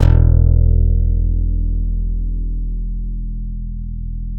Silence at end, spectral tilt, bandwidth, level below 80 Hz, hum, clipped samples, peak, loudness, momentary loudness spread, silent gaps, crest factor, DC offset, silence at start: 0 s; -10 dB/octave; 3.2 kHz; -16 dBFS; none; under 0.1%; 0 dBFS; -19 LUFS; 15 LU; none; 14 dB; under 0.1%; 0 s